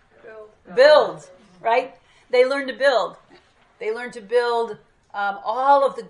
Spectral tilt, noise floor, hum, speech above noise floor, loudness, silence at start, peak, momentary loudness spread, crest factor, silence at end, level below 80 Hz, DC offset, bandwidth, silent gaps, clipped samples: -3.5 dB/octave; -54 dBFS; none; 34 dB; -20 LUFS; 0.25 s; -2 dBFS; 16 LU; 20 dB; 0 s; -68 dBFS; under 0.1%; 11 kHz; none; under 0.1%